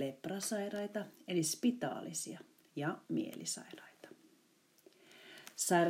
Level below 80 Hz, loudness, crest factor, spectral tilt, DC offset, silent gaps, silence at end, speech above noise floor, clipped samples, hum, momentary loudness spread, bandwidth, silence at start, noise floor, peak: under -90 dBFS; -39 LUFS; 22 dB; -4 dB/octave; under 0.1%; none; 0 s; 33 dB; under 0.1%; none; 20 LU; 16 kHz; 0 s; -70 dBFS; -18 dBFS